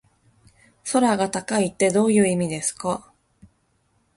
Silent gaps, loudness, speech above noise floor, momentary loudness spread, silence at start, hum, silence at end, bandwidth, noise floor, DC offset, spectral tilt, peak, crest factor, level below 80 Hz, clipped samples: none; -22 LUFS; 45 dB; 10 LU; 0.85 s; none; 1.15 s; 11.5 kHz; -66 dBFS; under 0.1%; -4.5 dB/octave; -6 dBFS; 18 dB; -60 dBFS; under 0.1%